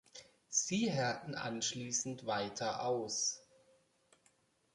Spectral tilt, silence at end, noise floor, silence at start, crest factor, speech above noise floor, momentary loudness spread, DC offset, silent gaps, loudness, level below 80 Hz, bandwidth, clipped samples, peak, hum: -3 dB/octave; 1.35 s; -74 dBFS; 0.15 s; 18 dB; 36 dB; 7 LU; under 0.1%; none; -37 LUFS; -76 dBFS; 11.5 kHz; under 0.1%; -20 dBFS; none